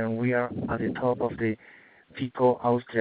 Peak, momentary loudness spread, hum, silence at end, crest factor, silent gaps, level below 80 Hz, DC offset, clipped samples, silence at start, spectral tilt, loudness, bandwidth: -10 dBFS; 11 LU; none; 0 s; 16 dB; none; -58 dBFS; under 0.1%; under 0.1%; 0 s; -6.5 dB/octave; -27 LUFS; 4.8 kHz